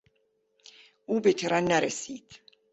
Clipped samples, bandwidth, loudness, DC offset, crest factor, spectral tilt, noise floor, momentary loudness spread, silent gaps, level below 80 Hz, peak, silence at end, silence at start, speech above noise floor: under 0.1%; 8.2 kHz; -27 LUFS; under 0.1%; 20 dB; -4 dB/octave; -72 dBFS; 18 LU; none; -68 dBFS; -10 dBFS; 0.35 s; 1.1 s; 46 dB